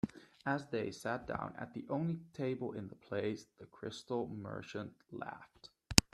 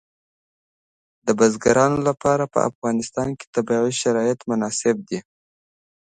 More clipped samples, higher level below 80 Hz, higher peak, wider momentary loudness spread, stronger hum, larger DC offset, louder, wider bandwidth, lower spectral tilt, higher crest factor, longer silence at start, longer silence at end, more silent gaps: neither; about the same, -58 dBFS vs -56 dBFS; about the same, 0 dBFS vs -2 dBFS; about the same, 10 LU vs 9 LU; neither; neither; second, -40 LUFS vs -21 LUFS; first, 13.5 kHz vs 9.4 kHz; about the same, -4 dB/octave vs -5 dB/octave; first, 40 dB vs 20 dB; second, 0.05 s vs 1.25 s; second, 0.1 s vs 0.8 s; second, none vs 2.75-2.82 s, 3.47-3.53 s